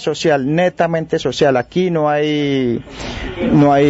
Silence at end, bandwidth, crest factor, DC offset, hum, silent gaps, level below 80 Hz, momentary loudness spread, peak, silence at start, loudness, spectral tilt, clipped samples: 0 s; 8 kHz; 12 dB; under 0.1%; none; none; -40 dBFS; 9 LU; -4 dBFS; 0 s; -16 LUFS; -6.5 dB/octave; under 0.1%